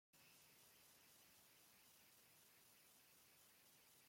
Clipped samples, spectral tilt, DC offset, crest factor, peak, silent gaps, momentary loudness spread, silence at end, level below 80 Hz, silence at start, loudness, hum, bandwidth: under 0.1%; -1 dB/octave; under 0.1%; 14 dB; -56 dBFS; none; 1 LU; 0 s; under -90 dBFS; 0.15 s; -69 LUFS; none; 16.5 kHz